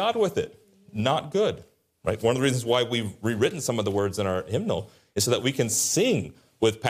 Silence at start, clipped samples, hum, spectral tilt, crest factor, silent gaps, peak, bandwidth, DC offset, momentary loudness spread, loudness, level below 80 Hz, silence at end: 0 s; under 0.1%; none; -4 dB/octave; 16 dB; none; -10 dBFS; 15.5 kHz; under 0.1%; 9 LU; -25 LUFS; -60 dBFS; 0 s